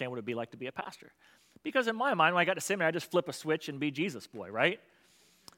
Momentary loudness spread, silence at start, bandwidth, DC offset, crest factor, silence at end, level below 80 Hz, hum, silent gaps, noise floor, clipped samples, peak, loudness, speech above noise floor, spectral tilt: 15 LU; 0 s; 16.5 kHz; under 0.1%; 22 dB; 0.8 s; -84 dBFS; none; none; -65 dBFS; under 0.1%; -10 dBFS; -31 LUFS; 32 dB; -4 dB/octave